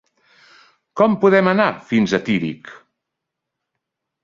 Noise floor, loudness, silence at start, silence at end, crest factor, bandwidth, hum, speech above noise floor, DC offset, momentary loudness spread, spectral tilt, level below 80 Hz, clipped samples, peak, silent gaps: -81 dBFS; -17 LUFS; 0.95 s; 1.5 s; 18 dB; 7.4 kHz; none; 64 dB; under 0.1%; 15 LU; -6.5 dB/octave; -60 dBFS; under 0.1%; -2 dBFS; none